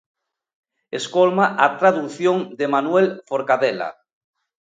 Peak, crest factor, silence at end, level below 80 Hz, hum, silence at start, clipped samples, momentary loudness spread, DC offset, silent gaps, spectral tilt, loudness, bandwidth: 0 dBFS; 20 dB; 0.75 s; -72 dBFS; none; 0.95 s; under 0.1%; 12 LU; under 0.1%; none; -5.5 dB/octave; -19 LUFS; 9.2 kHz